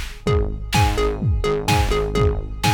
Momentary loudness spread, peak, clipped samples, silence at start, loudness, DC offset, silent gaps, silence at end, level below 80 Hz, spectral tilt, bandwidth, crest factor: 3 LU; -6 dBFS; under 0.1%; 0 s; -21 LUFS; under 0.1%; none; 0 s; -24 dBFS; -5 dB/octave; over 20 kHz; 14 dB